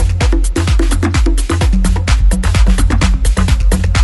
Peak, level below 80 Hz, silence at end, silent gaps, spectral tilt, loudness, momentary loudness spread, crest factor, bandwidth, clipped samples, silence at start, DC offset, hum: 0 dBFS; -12 dBFS; 0 s; none; -5.5 dB/octave; -14 LUFS; 2 LU; 10 dB; 12 kHz; under 0.1%; 0 s; under 0.1%; none